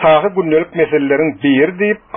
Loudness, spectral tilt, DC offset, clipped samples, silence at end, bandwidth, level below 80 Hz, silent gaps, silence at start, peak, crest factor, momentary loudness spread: -14 LUFS; -4.5 dB/octave; under 0.1%; under 0.1%; 0.2 s; 3.7 kHz; -50 dBFS; none; 0 s; 0 dBFS; 12 dB; 3 LU